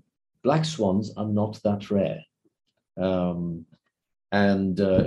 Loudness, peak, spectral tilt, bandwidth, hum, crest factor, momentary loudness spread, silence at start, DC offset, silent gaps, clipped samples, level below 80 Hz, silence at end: -26 LUFS; -6 dBFS; -7 dB/octave; 10.5 kHz; none; 18 dB; 10 LU; 0.45 s; under 0.1%; none; under 0.1%; -56 dBFS; 0 s